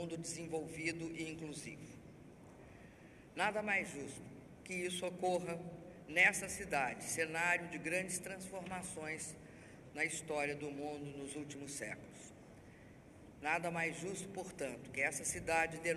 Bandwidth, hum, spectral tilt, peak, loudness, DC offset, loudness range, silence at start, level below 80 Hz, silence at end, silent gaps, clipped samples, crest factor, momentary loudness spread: 14 kHz; none; -3.5 dB/octave; -16 dBFS; -39 LUFS; under 0.1%; 8 LU; 0 s; -68 dBFS; 0 s; none; under 0.1%; 24 dB; 23 LU